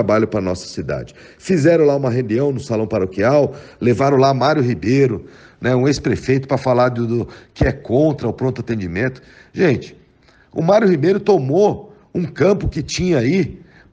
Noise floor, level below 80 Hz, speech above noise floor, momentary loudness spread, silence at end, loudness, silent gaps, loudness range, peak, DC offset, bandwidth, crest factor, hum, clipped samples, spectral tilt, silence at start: -51 dBFS; -40 dBFS; 35 dB; 11 LU; 0.35 s; -17 LUFS; none; 3 LU; -2 dBFS; under 0.1%; 9.4 kHz; 14 dB; none; under 0.1%; -7 dB/octave; 0 s